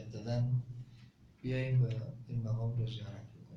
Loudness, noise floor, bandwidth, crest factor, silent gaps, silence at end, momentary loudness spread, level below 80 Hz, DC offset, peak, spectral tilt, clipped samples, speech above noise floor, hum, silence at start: -36 LUFS; -59 dBFS; 6.4 kHz; 14 dB; none; 0 s; 16 LU; -60 dBFS; under 0.1%; -22 dBFS; -8.5 dB/octave; under 0.1%; 24 dB; none; 0 s